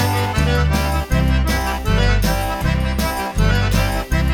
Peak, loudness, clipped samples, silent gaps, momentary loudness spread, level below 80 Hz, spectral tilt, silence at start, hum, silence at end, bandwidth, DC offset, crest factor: -4 dBFS; -18 LUFS; under 0.1%; none; 3 LU; -20 dBFS; -5.5 dB/octave; 0 s; none; 0 s; 19 kHz; under 0.1%; 12 dB